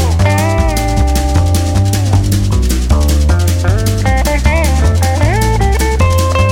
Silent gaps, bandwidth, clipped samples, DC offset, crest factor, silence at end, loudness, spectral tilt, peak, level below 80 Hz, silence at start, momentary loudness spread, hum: none; 17 kHz; under 0.1%; under 0.1%; 10 dB; 0 s; -12 LUFS; -5.5 dB/octave; 0 dBFS; -14 dBFS; 0 s; 2 LU; none